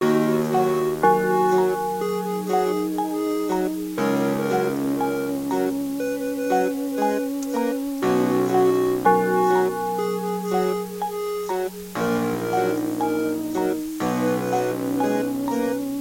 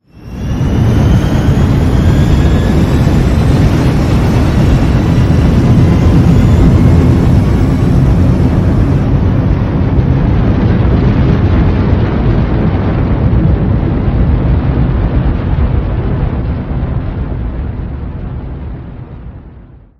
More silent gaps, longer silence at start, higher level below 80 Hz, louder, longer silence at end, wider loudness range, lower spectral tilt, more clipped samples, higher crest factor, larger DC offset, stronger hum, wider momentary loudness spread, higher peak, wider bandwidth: neither; second, 0 s vs 0.2 s; second, -58 dBFS vs -16 dBFS; second, -23 LUFS vs -11 LUFS; second, 0 s vs 0.4 s; second, 4 LU vs 8 LU; second, -6 dB/octave vs -8.5 dB/octave; second, under 0.1% vs 0.6%; first, 18 dB vs 10 dB; neither; neither; second, 7 LU vs 12 LU; second, -6 dBFS vs 0 dBFS; first, 16.5 kHz vs 12.5 kHz